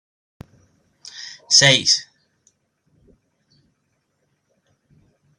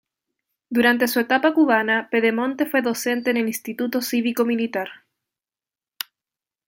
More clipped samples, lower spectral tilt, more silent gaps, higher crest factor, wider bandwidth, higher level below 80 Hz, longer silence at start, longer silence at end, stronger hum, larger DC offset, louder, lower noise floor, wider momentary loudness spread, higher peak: neither; second, -1 dB/octave vs -3.5 dB/octave; neither; first, 24 dB vs 18 dB; second, 14.5 kHz vs 17 kHz; first, -64 dBFS vs -72 dBFS; first, 1.15 s vs 0.7 s; first, 3.35 s vs 1.7 s; neither; neither; first, -14 LUFS vs -21 LUFS; second, -70 dBFS vs under -90 dBFS; first, 24 LU vs 13 LU; first, 0 dBFS vs -4 dBFS